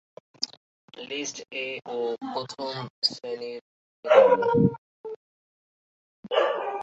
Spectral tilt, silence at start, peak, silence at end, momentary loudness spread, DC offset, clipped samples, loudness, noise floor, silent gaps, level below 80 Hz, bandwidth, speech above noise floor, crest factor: -5 dB/octave; 0.4 s; -4 dBFS; 0 s; 22 LU; under 0.1%; under 0.1%; -25 LUFS; under -90 dBFS; 0.57-0.88 s, 2.90-3.02 s, 3.61-4.03 s, 4.78-5.04 s, 5.16-6.23 s; -64 dBFS; 8 kHz; over 65 dB; 24 dB